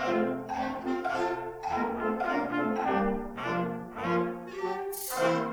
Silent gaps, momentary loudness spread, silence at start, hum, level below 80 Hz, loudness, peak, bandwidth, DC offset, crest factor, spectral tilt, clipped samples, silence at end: none; 6 LU; 0 s; none; -54 dBFS; -31 LUFS; -16 dBFS; over 20 kHz; under 0.1%; 16 dB; -5.5 dB/octave; under 0.1%; 0 s